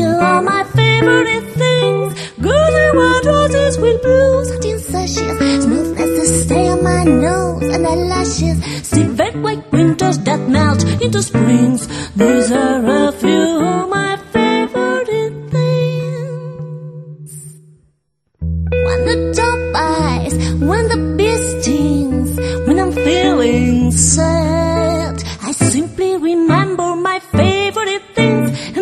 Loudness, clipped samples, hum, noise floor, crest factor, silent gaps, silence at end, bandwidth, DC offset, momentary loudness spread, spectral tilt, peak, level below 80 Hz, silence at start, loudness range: -14 LUFS; under 0.1%; none; -64 dBFS; 14 dB; none; 0 s; 13 kHz; under 0.1%; 8 LU; -5 dB/octave; 0 dBFS; -30 dBFS; 0 s; 6 LU